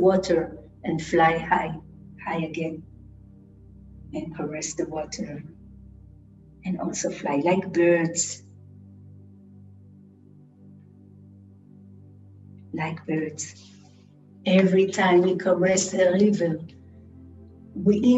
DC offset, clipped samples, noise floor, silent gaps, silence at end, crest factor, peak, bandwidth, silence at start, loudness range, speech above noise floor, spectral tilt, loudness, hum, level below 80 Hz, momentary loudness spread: under 0.1%; under 0.1%; -52 dBFS; none; 0 s; 18 dB; -8 dBFS; 8.6 kHz; 0 s; 13 LU; 29 dB; -5 dB/octave; -24 LUFS; none; -56 dBFS; 17 LU